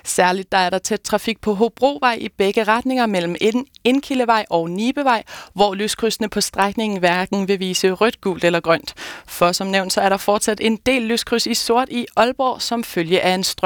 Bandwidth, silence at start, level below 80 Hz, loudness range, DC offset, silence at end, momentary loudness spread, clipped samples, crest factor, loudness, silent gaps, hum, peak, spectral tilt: 19.5 kHz; 0.05 s; -50 dBFS; 1 LU; under 0.1%; 0 s; 4 LU; under 0.1%; 16 dB; -18 LUFS; none; none; -2 dBFS; -3.5 dB/octave